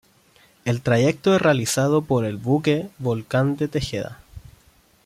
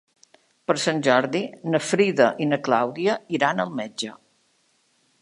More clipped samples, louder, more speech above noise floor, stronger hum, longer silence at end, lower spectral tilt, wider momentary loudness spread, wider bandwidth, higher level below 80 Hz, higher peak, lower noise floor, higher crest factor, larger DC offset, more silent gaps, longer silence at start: neither; about the same, -21 LUFS vs -23 LUFS; second, 36 dB vs 43 dB; neither; second, 0.65 s vs 1.1 s; about the same, -5.5 dB/octave vs -4.5 dB/octave; about the same, 9 LU vs 10 LU; first, 15.5 kHz vs 11.5 kHz; first, -50 dBFS vs -74 dBFS; second, -6 dBFS vs -2 dBFS; second, -57 dBFS vs -66 dBFS; second, 16 dB vs 22 dB; neither; neither; about the same, 0.65 s vs 0.7 s